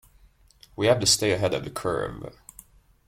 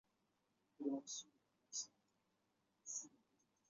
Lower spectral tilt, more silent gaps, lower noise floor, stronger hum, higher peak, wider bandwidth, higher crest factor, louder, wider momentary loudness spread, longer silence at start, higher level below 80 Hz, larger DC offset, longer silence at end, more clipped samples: about the same, -3 dB/octave vs -4 dB/octave; neither; second, -57 dBFS vs -85 dBFS; neither; first, -6 dBFS vs -32 dBFS; first, 16.5 kHz vs 7.6 kHz; about the same, 20 dB vs 22 dB; first, -24 LUFS vs -49 LUFS; first, 21 LU vs 14 LU; about the same, 0.8 s vs 0.8 s; first, -52 dBFS vs under -90 dBFS; neither; first, 0.75 s vs 0.6 s; neither